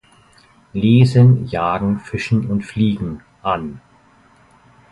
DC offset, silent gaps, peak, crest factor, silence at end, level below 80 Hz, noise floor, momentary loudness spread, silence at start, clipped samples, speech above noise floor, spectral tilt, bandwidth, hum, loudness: under 0.1%; none; -2 dBFS; 16 dB; 1.15 s; -44 dBFS; -51 dBFS; 14 LU; 0.75 s; under 0.1%; 36 dB; -8.5 dB/octave; 11 kHz; none; -17 LUFS